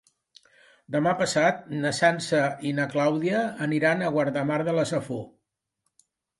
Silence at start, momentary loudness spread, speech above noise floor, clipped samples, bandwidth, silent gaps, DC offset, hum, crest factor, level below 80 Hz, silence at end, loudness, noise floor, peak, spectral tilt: 0.9 s; 7 LU; 54 dB; under 0.1%; 11.5 kHz; none; under 0.1%; none; 18 dB; -68 dBFS; 1.1 s; -25 LUFS; -78 dBFS; -8 dBFS; -5 dB/octave